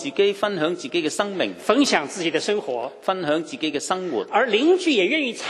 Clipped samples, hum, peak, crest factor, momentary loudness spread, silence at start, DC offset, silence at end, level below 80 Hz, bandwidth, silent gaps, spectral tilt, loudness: under 0.1%; none; -2 dBFS; 20 dB; 7 LU; 0 s; under 0.1%; 0 s; -72 dBFS; 13 kHz; none; -3.5 dB/octave; -22 LUFS